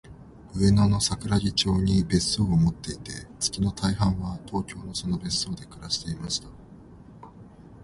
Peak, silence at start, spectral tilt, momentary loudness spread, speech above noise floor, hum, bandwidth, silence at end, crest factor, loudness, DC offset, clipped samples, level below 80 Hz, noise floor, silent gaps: -8 dBFS; 0.05 s; -5 dB/octave; 11 LU; 22 dB; none; 11.5 kHz; 0 s; 18 dB; -26 LUFS; under 0.1%; under 0.1%; -42 dBFS; -47 dBFS; none